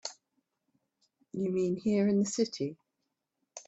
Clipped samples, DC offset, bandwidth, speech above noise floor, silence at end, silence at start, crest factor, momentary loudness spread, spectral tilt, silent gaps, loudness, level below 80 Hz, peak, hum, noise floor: under 0.1%; under 0.1%; 8.2 kHz; 54 dB; 0.05 s; 0.05 s; 18 dB; 16 LU; -5.5 dB/octave; none; -31 LUFS; -74 dBFS; -16 dBFS; none; -84 dBFS